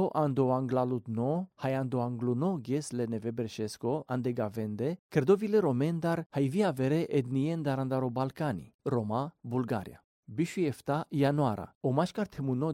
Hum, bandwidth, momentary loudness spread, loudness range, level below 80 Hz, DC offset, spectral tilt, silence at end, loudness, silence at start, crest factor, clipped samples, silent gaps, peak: none; 16 kHz; 7 LU; 4 LU; -68 dBFS; under 0.1%; -7.5 dB/octave; 0 s; -31 LUFS; 0 s; 18 dB; under 0.1%; 4.99-5.09 s, 6.26-6.30 s, 8.74-8.79 s, 10.04-10.23 s, 11.75-11.81 s; -14 dBFS